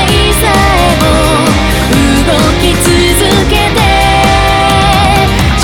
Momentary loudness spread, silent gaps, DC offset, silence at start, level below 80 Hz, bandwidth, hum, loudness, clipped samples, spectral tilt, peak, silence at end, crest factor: 2 LU; none; under 0.1%; 0 s; -16 dBFS; 19 kHz; none; -8 LUFS; 0.1%; -4.5 dB/octave; 0 dBFS; 0 s; 8 dB